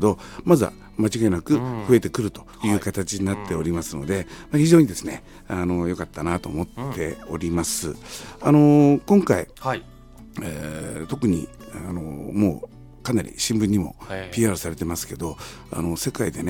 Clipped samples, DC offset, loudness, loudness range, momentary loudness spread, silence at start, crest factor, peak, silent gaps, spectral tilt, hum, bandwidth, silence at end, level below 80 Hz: under 0.1%; under 0.1%; -23 LUFS; 7 LU; 16 LU; 0 s; 20 dB; -2 dBFS; none; -6 dB/octave; none; 17 kHz; 0 s; -44 dBFS